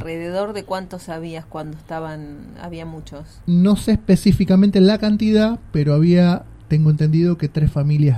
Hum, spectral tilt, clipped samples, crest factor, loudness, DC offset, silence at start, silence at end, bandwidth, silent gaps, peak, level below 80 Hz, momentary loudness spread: none; -8 dB/octave; under 0.1%; 14 dB; -17 LUFS; under 0.1%; 0 s; 0 s; 13 kHz; none; -2 dBFS; -38 dBFS; 18 LU